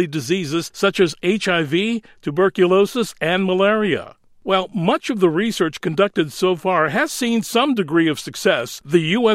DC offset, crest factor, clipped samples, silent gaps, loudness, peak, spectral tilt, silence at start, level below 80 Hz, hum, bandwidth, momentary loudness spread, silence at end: under 0.1%; 16 dB; under 0.1%; none; -19 LUFS; -2 dBFS; -5 dB/octave; 0 s; -60 dBFS; none; 16 kHz; 5 LU; 0 s